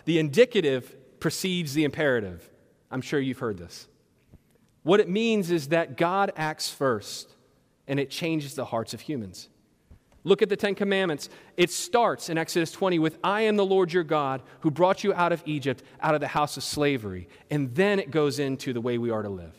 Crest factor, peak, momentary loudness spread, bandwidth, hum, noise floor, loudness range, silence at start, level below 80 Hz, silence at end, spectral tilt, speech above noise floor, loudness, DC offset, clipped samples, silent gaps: 20 dB; -6 dBFS; 12 LU; 16 kHz; none; -64 dBFS; 5 LU; 0.05 s; -66 dBFS; 0.05 s; -5 dB/octave; 38 dB; -26 LUFS; under 0.1%; under 0.1%; none